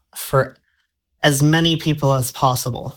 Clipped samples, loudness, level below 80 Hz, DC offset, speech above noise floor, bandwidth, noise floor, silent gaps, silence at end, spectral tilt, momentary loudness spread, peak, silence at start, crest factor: under 0.1%; -18 LUFS; -46 dBFS; under 0.1%; 51 dB; 19 kHz; -69 dBFS; none; 0.05 s; -5 dB/octave; 6 LU; -2 dBFS; 0.15 s; 18 dB